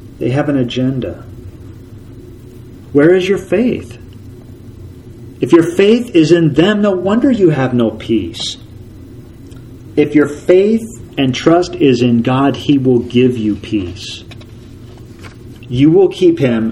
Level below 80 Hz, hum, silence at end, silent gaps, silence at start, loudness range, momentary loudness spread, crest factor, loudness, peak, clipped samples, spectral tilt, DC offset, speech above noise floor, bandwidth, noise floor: -42 dBFS; none; 0 s; none; 0 s; 5 LU; 24 LU; 14 dB; -12 LUFS; 0 dBFS; under 0.1%; -7 dB/octave; under 0.1%; 22 dB; 12 kHz; -34 dBFS